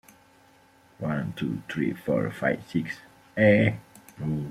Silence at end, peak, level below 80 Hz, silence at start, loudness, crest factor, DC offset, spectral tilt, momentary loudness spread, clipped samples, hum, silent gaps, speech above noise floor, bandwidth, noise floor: 0 s; -6 dBFS; -60 dBFS; 1 s; -27 LUFS; 20 dB; under 0.1%; -7.5 dB/octave; 16 LU; under 0.1%; none; none; 32 dB; 14.5 kHz; -58 dBFS